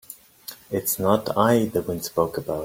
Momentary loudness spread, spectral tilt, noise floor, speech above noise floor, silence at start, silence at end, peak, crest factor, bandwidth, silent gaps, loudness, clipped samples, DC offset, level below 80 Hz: 19 LU; -5 dB/octave; -43 dBFS; 21 dB; 0.1 s; 0 s; -4 dBFS; 20 dB; 17 kHz; none; -23 LUFS; under 0.1%; under 0.1%; -56 dBFS